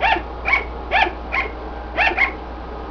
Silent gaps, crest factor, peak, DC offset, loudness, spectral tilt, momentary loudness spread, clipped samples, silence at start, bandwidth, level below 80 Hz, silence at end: none; 18 dB; -2 dBFS; under 0.1%; -19 LUFS; -5 dB/octave; 15 LU; under 0.1%; 0 s; 5.4 kHz; -32 dBFS; 0 s